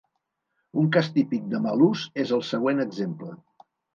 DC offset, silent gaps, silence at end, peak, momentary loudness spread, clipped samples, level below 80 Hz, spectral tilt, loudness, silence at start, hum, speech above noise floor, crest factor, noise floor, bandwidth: under 0.1%; none; 0.6 s; -6 dBFS; 10 LU; under 0.1%; -74 dBFS; -7 dB/octave; -25 LUFS; 0.75 s; none; 55 dB; 18 dB; -79 dBFS; 7.4 kHz